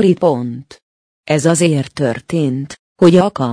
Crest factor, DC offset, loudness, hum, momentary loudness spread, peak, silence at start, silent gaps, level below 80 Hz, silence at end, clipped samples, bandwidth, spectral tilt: 14 dB; under 0.1%; -14 LUFS; none; 14 LU; 0 dBFS; 0 s; 0.82-1.24 s, 2.79-2.96 s; -54 dBFS; 0 s; under 0.1%; 10.5 kHz; -6 dB/octave